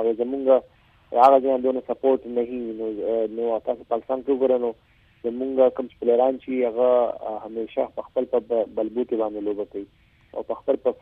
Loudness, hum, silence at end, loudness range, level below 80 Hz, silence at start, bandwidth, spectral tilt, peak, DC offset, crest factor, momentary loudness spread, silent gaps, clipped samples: -23 LUFS; none; 0.05 s; 5 LU; -62 dBFS; 0 s; 5 kHz; -7.5 dB/octave; -4 dBFS; under 0.1%; 20 dB; 11 LU; none; under 0.1%